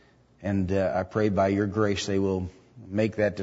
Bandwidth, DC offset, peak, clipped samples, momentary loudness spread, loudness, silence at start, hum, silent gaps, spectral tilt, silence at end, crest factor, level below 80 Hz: 8 kHz; under 0.1%; -12 dBFS; under 0.1%; 8 LU; -27 LUFS; 0.4 s; none; none; -6.5 dB/octave; 0 s; 16 dB; -54 dBFS